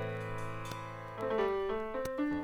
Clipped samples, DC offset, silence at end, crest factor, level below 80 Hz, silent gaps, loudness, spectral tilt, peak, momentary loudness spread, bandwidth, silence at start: under 0.1%; under 0.1%; 0 s; 14 dB; -56 dBFS; none; -37 LUFS; -6.5 dB/octave; -22 dBFS; 9 LU; 20 kHz; 0 s